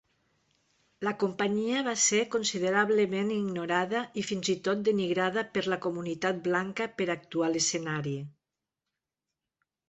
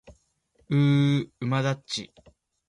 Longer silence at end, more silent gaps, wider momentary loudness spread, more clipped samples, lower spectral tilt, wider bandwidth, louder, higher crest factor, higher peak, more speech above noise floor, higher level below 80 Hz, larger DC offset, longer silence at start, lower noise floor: first, 1.6 s vs 0.65 s; neither; second, 8 LU vs 12 LU; neither; second, -3.5 dB/octave vs -6.5 dB/octave; second, 8.4 kHz vs 11 kHz; second, -29 LUFS vs -25 LUFS; about the same, 18 dB vs 14 dB; about the same, -12 dBFS vs -12 dBFS; first, 59 dB vs 43 dB; second, -72 dBFS vs -62 dBFS; neither; first, 1 s vs 0.1 s; first, -88 dBFS vs -67 dBFS